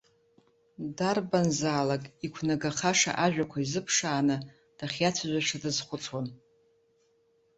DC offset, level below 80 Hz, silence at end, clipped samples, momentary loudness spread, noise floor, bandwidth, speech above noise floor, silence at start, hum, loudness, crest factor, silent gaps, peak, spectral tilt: under 0.1%; -66 dBFS; 1.25 s; under 0.1%; 13 LU; -69 dBFS; 8.4 kHz; 39 dB; 0.8 s; none; -29 LUFS; 20 dB; none; -10 dBFS; -3.5 dB/octave